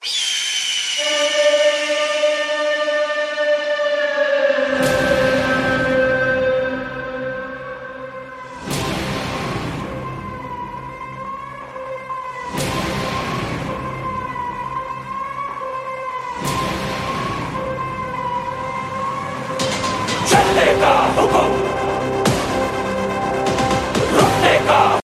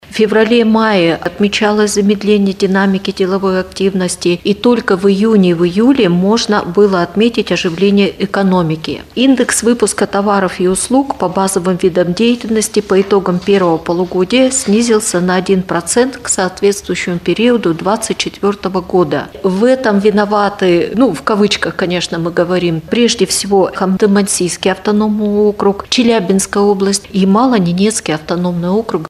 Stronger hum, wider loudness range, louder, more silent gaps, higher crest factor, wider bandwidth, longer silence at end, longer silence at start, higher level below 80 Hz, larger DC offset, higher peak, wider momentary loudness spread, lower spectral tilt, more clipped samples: neither; first, 9 LU vs 2 LU; second, -19 LUFS vs -12 LUFS; neither; first, 18 dB vs 12 dB; first, 15.5 kHz vs 14 kHz; about the same, 0 s vs 0 s; about the same, 0 s vs 0.1 s; about the same, -42 dBFS vs -44 dBFS; neither; about the same, 0 dBFS vs 0 dBFS; first, 14 LU vs 5 LU; about the same, -3.5 dB/octave vs -4.5 dB/octave; neither